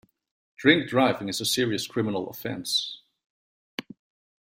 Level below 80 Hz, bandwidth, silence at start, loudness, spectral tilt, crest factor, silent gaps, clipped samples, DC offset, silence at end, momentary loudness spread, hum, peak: -66 dBFS; 16.5 kHz; 0.6 s; -25 LUFS; -3.5 dB/octave; 24 dB; 3.26-3.78 s; under 0.1%; under 0.1%; 0.6 s; 18 LU; none; -4 dBFS